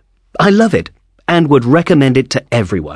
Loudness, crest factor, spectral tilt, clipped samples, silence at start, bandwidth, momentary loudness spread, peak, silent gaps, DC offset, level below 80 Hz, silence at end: -12 LUFS; 12 dB; -6.5 dB/octave; under 0.1%; 0.4 s; 11 kHz; 11 LU; 0 dBFS; none; under 0.1%; -42 dBFS; 0 s